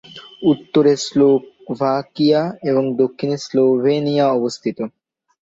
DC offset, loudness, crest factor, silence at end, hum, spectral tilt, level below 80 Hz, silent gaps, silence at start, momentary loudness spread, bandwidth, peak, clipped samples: under 0.1%; -17 LUFS; 16 dB; 0.55 s; none; -6 dB/octave; -62 dBFS; none; 0.15 s; 9 LU; 7.8 kHz; -2 dBFS; under 0.1%